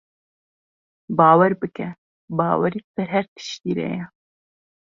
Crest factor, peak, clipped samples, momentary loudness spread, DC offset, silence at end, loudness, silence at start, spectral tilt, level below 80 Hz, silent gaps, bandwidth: 20 dB; -2 dBFS; under 0.1%; 17 LU; under 0.1%; 0.8 s; -21 LUFS; 1.1 s; -7 dB/octave; -64 dBFS; 1.98-2.28 s, 2.84-2.94 s, 3.28-3.36 s; 7.4 kHz